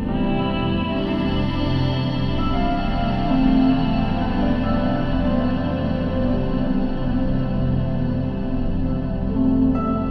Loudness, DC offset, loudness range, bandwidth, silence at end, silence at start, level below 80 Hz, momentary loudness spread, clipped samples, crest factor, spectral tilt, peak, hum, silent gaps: -21 LUFS; under 0.1%; 2 LU; 6 kHz; 0 s; 0 s; -26 dBFS; 5 LU; under 0.1%; 14 dB; -9.5 dB/octave; -6 dBFS; none; none